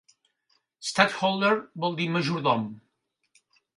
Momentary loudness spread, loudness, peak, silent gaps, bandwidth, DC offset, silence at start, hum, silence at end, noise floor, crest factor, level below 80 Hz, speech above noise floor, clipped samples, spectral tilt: 8 LU; -25 LUFS; -2 dBFS; none; 11.5 kHz; under 0.1%; 0.8 s; none; 1 s; -76 dBFS; 26 dB; -72 dBFS; 51 dB; under 0.1%; -4.5 dB/octave